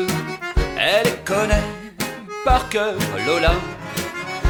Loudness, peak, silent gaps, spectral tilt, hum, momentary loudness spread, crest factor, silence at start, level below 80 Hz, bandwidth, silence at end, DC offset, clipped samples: -21 LUFS; -4 dBFS; none; -4.5 dB/octave; none; 10 LU; 18 dB; 0 s; -28 dBFS; over 20 kHz; 0 s; under 0.1%; under 0.1%